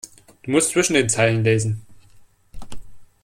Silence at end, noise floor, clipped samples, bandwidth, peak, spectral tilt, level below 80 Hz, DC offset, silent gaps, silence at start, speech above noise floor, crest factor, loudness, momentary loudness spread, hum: 0.2 s; -50 dBFS; under 0.1%; 15.5 kHz; -4 dBFS; -4 dB/octave; -46 dBFS; under 0.1%; none; 0.05 s; 32 dB; 18 dB; -19 LUFS; 16 LU; none